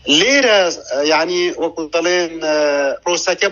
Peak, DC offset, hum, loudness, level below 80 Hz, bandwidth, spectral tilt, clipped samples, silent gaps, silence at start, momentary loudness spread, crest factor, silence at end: -2 dBFS; under 0.1%; none; -15 LUFS; -54 dBFS; 7.4 kHz; -1.5 dB/octave; under 0.1%; none; 0.05 s; 8 LU; 14 dB; 0 s